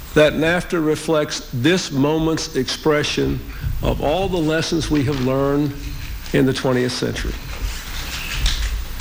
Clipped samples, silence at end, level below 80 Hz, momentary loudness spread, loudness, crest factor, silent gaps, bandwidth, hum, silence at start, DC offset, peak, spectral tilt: under 0.1%; 0 s; -30 dBFS; 10 LU; -20 LUFS; 16 dB; none; 17 kHz; none; 0 s; under 0.1%; -2 dBFS; -5 dB/octave